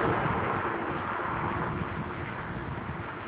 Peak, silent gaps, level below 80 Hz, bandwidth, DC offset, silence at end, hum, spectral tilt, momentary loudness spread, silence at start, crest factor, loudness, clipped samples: -16 dBFS; none; -48 dBFS; 4 kHz; under 0.1%; 0 s; none; -5.5 dB/octave; 8 LU; 0 s; 16 dB; -32 LUFS; under 0.1%